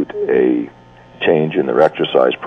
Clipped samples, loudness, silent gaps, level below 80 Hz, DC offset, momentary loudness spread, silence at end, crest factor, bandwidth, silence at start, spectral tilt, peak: under 0.1%; -15 LUFS; none; -54 dBFS; under 0.1%; 7 LU; 0 s; 16 dB; 6.2 kHz; 0 s; -7.5 dB/octave; 0 dBFS